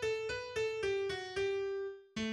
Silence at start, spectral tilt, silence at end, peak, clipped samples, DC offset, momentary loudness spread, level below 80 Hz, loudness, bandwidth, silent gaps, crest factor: 0 s; -4 dB/octave; 0 s; -26 dBFS; under 0.1%; under 0.1%; 5 LU; -64 dBFS; -37 LUFS; 11.5 kHz; none; 12 dB